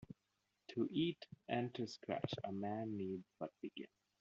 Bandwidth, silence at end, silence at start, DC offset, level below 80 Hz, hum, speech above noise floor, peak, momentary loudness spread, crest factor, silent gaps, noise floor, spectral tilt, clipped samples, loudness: 7.4 kHz; 0.35 s; 0 s; under 0.1%; -82 dBFS; none; 42 dB; -24 dBFS; 15 LU; 22 dB; none; -86 dBFS; -5 dB/octave; under 0.1%; -44 LUFS